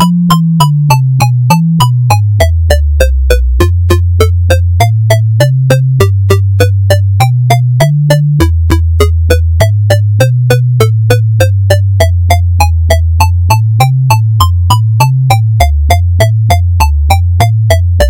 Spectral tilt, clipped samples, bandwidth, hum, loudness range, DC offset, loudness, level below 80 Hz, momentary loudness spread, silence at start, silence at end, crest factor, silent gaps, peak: -6 dB/octave; 1%; 17 kHz; none; 0 LU; under 0.1%; -8 LUFS; -18 dBFS; 2 LU; 0 s; 0 s; 6 dB; none; 0 dBFS